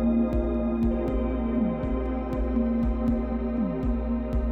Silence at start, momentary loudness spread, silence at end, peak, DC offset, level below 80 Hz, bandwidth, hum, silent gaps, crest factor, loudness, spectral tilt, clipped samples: 0 s; 3 LU; 0 s; -14 dBFS; under 0.1%; -30 dBFS; 4.3 kHz; none; none; 12 dB; -27 LUFS; -10.5 dB/octave; under 0.1%